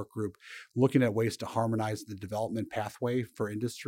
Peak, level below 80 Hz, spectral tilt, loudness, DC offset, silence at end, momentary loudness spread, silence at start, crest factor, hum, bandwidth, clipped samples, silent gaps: -12 dBFS; -68 dBFS; -6.5 dB/octave; -32 LUFS; under 0.1%; 0 s; 12 LU; 0 s; 20 dB; none; 16 kHz; under 0.1%; none